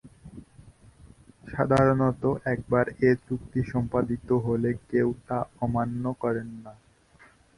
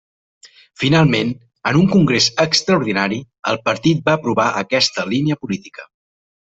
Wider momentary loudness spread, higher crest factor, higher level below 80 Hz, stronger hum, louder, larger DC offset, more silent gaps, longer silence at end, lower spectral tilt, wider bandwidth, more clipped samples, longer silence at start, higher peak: first, 13 LU vs 10 LU; about the same, 20 dB vs 16 dB; about the same, -50 dBFS vs -52 dBFS; neither; second, -26 LUFS vs -17 LUFS; neither; second, none vs 3.39-3.43 s; first, 0.85 s vs 0.65 s; first, -9 dB/octave vs -5 dB/octave; first, 11.5 kHz vs 8.2 kHz; neither; second, 0.05 s vs 0.45 s; second, -8 dBFS vs -2 dBFS